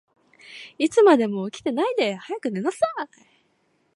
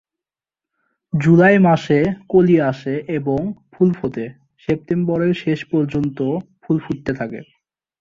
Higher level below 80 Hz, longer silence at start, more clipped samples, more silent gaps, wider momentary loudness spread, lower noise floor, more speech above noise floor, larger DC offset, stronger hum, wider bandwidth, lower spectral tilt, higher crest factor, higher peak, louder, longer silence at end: second, -72 dBFS vs -52 dBFS; second, 0.5 s vs 1.15 s; neither; neither; first, 21 LU vs 14 LU; second, -67 dBFS vs -89 dBFS; second, 45 dB vs 72 dB; neither; neither; first, 11.5 kHz vs 7.4 kHz; second, -5 dB/octave vs -8.5 dB/octave; about the same, 18 dB vs 16 dB; second, -6 dBFS vs -2 dBFS; second, -22 LUFS vs -18 LUFS; first, 0.9 s vs 0.6 s